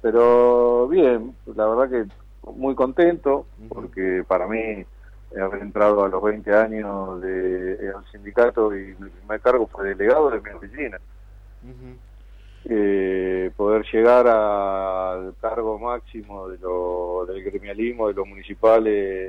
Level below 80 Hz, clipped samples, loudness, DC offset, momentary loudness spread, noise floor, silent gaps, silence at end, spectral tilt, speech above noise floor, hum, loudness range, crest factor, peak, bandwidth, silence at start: -44 dBFS; under 0.1%; -21 LUFS; under 0.1%; 17 LU; -44 dBFS; none; 0 s; -8 dB/octave; 23 dB; none; 6 LU; 16 dB; -6 dBFS; 5.6 kHz; 0.05 s